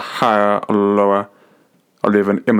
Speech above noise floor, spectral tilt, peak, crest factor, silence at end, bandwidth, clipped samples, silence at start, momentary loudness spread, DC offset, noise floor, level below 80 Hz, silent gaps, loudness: 41 dB; -7 dB/octave; 0 dBFS; 16 dB; 0 s; 15 kHz; under 0.1%; 0 s; 7 LU; under 0.1%; -56 dBFS; -66 dBFS; none; -16 LUFS